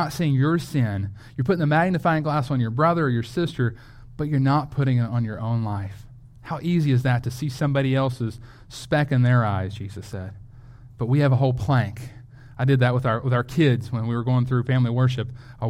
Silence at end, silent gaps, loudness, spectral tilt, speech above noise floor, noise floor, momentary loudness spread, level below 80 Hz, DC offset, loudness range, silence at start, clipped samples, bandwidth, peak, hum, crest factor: 0 s; none; -23 LUFS; -7.5 dB/octave; 22 dB; -44 dBFS; 13 LU; -48 dBFS; under 0.1%; 3 LU; 0 s; under 0.1%; 11.5 kHz; -6 dBFS; none; 16 dB